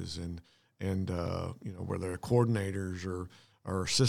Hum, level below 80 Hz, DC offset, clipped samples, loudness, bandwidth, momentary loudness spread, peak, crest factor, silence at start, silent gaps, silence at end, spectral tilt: none; -60 dBFS; under 0.1%; under 0.1%; -35 LUFS; 15.5 kHz; 14 LU; -14 dBFS; 20 dB; 0 s; none; 0 s; -5.5 dB/octave